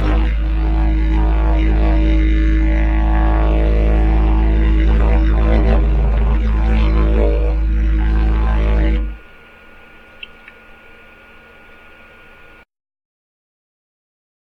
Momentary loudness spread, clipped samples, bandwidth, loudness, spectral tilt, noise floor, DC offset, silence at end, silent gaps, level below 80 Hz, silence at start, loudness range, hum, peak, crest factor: 4 LU; under 0.1%; 4.2 kHz; -16 LUFS; -9 dB/octave; -43 dBFS; under 0.1%; 4.3 s; none; -16 dBFS; 0 s; 6 LU; none; -2 dBFS; 14 dB